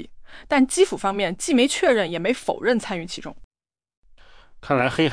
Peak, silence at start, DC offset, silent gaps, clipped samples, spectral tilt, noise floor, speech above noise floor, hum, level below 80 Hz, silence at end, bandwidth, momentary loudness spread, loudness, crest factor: -6 dBFS; 0 s; under 0.1%; 3.44-3.51 s, 3.97-4.03 s; under 0.1%; -4 dB/octave; -48 dBFS; 27 dB; none; -50 dBFS; 0 s; 10.5 kHz; 13 LU; -21 LUFS; 18 dB